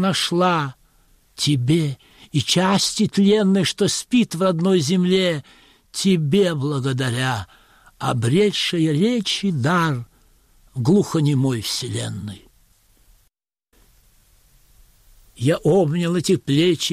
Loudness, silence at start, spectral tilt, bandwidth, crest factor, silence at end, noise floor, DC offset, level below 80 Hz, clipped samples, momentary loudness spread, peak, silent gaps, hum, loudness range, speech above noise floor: -19 LUFS; 0 s; -5 dB/octave; 15.5 kHz; 16 dB; 0 s; -67 dBFS; under 0.1%; -54 dBFS; under 0.1%; 10 LU; -6 dBFS; none; none; 7 LU; 48 dB